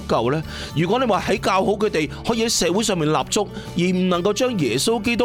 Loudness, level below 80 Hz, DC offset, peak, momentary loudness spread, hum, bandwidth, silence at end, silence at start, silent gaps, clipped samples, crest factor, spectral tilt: -20 LUFS; -42 dBFS; under 0.1%; -4 dBFS; 5 LU; none; 17 kHz; 0 s; 0 s; none; under 0.1%; 16 dB; -4.5 dB/octave